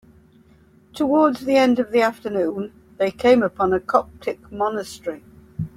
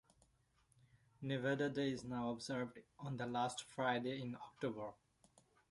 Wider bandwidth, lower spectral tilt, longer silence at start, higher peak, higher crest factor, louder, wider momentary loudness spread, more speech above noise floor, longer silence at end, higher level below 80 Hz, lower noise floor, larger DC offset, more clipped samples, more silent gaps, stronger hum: first, 15.5 kHz vs 11.5 kHz; about the same, -6 dB/octave vs -5.5 dB/octave; second, 0.95 s vs 1.2 s; first, -2 dBFS vs -26 dBFS; about the same, 20 dB vs 18 dB; first, -20 LUFS vs -43 LUFS; first, 15 LU vs 11 LU; about the same, 33 dB vs 34 dB; second, 0.1 s vs 0.75 s; first, -54 dBFS vs -76 dBFS; second, -53 dBFS vs -77 dBFS; neither; neither; neither; neither